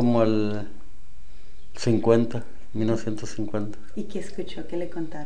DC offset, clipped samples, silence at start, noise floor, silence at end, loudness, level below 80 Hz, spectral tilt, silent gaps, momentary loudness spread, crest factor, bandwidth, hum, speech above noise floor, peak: 6%; under 0.1%; 0 s; -48 dBFS; 0 s; -27 LUFS; -50 dBFS; -7 dB/octave; none; 15 LU; 22 dB; 10 kHz; none; 23 dB; -4 dBFS